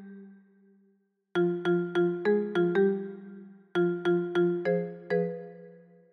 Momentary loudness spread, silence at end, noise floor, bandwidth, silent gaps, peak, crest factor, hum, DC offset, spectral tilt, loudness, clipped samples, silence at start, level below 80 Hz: 17 LU; 0.4 s; -70 dBFS; 6.2 kHz; none; -16 dBFS; 14 dB; none; under 0.1%; -8.5 dB/octave; -28 LUFS; under 0.1%; 0 s; -76 dBFS